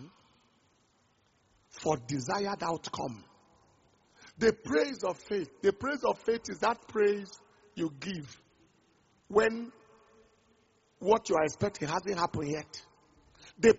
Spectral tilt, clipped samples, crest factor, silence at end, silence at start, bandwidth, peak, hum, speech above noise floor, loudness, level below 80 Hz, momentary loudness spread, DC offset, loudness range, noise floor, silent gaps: -4 dB/octave; under 0.1%; 22 dB; 0 s; 0 s; 8 kHz; -10 dBFS; none; 39 dB; -32 LUFS; -64 dBFS; 14 LU; under 0.1%; 5 LU; -70 dBFS; none